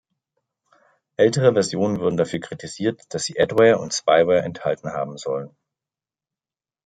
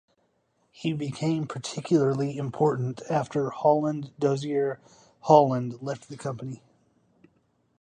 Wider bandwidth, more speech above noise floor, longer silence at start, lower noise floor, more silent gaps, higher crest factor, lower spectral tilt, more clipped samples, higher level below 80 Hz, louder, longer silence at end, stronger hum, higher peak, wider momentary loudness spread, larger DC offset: about the same, 9.4 kHz vs 10 kHz; first, over 70 dB vs 45 dB; first, 1.2 s vs 0.8 s; first, under -90 dBFS vs -71 dBFS; neither; about the same, 20 dB vs 24 dB; second, -5 dB/octave vs -7 dB/octave; neither; first, -62 dBFS vs -68 dBFS; first, -21 LUFS vs -26 LUFS; first, 1.4 s vs 1.25 s; neither; about the same, -2 dBFS vs -4 dBFS; second, 12 LU vs 15 LU; neither